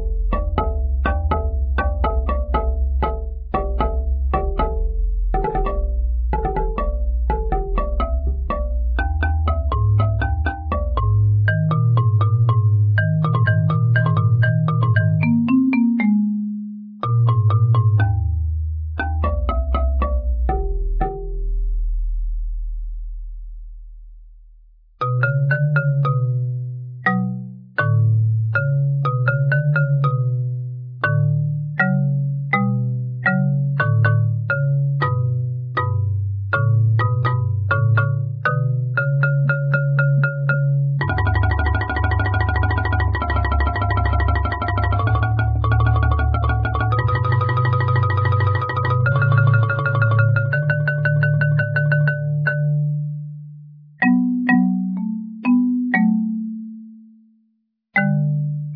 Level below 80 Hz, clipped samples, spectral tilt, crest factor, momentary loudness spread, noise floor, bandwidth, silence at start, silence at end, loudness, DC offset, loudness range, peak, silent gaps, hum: -26 dBFS; under 0.1%; -11 dB/octave; 14 dB; 8 LU; -67 dBFS; 5 kHz; 0 s; 0 s; -19 LUFS; under 0.1%; 6 LU; -4 dBFS; none; none